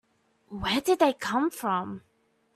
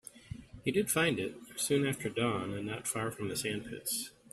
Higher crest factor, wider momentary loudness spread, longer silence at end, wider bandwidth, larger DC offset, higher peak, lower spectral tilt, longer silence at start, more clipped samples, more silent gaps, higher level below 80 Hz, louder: about the same, 20 dB vs 18 dB; first, 17 LU vs 9 LU; first, 0.55 s vs 0.2 s; about the same, 15 kHz vs 15.5 kHz; neither; first, -10 dBFS vs -16 dBFS; about the same, -4 dB/octave vs -4 dB/octave; first, 0.5 s vs 0.15 s; neither; neither; first, -56 dBFS vs -64 dBFS; first, -27 LUFS vs -34 LUFS